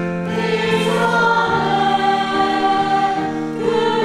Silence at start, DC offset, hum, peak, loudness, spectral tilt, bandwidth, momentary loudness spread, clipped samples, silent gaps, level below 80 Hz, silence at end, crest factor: 0 s; under 0.1%; none; -2 dBFS; -17 LUFS; -5.5 dB/octave; 14 kHz; 6 LU; under 0.1%; none; -50 dBFS; 0 s; 14 dB